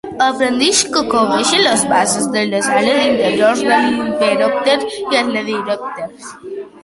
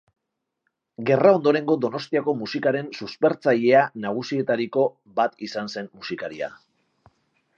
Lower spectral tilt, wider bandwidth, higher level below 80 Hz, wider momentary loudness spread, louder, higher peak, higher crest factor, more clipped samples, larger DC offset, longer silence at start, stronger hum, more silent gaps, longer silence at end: second, -2.5 dB/octave vs -6.5 dB/octave; first, 11.5 kHz vs 7.4 kHz; first, -52 dBFS vs -72 dBFS; second, 12 LU vs 15 LU; first, -14 LUFS vs -23 LUFS; about the same, 0 dBFS vs -2 dBFS; second, 14 dB vs 20 dB; neither; neither; second, 0.05 s vs 1 s; neither; neither; second, 0.05 s vs 1.1 s